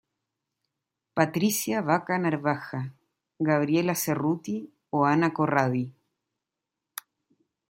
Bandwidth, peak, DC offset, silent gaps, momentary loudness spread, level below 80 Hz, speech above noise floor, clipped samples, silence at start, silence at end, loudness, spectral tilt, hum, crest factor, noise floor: 16.5 kHz; -4 dBFS; under 0.1%; none; 14 LU; -72 dBFS; 61 dB; under 0.1%; 1.15 s; 1.8 s; -26 LUFS; -5.5 dB/octave; none; 24 dB; -87 dBFS